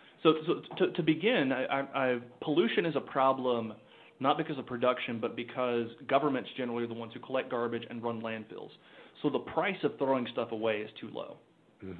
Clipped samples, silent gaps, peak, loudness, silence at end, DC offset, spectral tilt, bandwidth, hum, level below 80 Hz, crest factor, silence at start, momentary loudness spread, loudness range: under 0.1%; none; -12 dBFS; -32 LUFS; 0 s; under 0.1%; -8.5 dB/octave; 4.6 kHz; none; -76 dBFS; 20 dB; 0.2 s; 13 LU; 5 LU